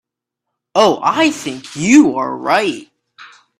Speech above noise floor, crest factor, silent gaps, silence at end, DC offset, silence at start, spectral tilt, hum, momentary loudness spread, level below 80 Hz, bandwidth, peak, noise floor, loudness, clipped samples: 66 dB; 16 dB; none; 0.35 s; under 0.1%; 0.75 s; -4 dB/octave; none; 14 LU; -56 dBFS; 13 kHz; 0 dBFS; -79 dBFS; -14 LUFS; under 0.1%